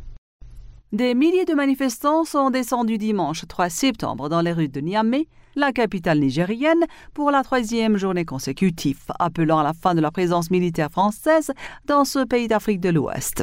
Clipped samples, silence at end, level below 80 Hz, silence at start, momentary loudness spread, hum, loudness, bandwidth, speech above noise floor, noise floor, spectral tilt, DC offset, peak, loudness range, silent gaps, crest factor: under 0.1%; 0 s; -48 dBFS; 0 s; 6 LU; none; -21 LUFS; 16 kHz; 20 dB; -40 dBFS; -5.5 dB/octave; under 0.1%; -6 dBFS; 1 LU; 0.18-0.40 s; 14 dB